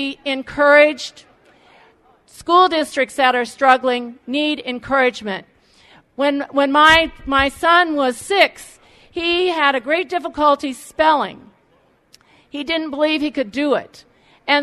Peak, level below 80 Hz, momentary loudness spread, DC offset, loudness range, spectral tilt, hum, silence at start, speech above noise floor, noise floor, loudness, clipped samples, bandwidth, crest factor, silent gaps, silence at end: 0 dBFS; -48 dBFS; 15 LU; under 0.1%; 5 LU; -3 dB/octave; none; 0 s; 40 dB; -57 dBFS; -16 LUFS; under 0.1%; 13.5 kHz; 18 dB; none; 0 s